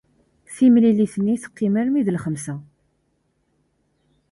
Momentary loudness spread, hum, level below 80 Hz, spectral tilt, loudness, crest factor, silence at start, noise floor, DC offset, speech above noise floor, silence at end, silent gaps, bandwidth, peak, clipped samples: 17 LU; none; -62 dBFS; -7.5 dB/octave; -19 LUFS; 16 dB; 0.5 s; -68 dBFS; under 0.1%; 50 dB; 1.7 s; none; 11.5 kHz; -6 dBFS; under 0.1%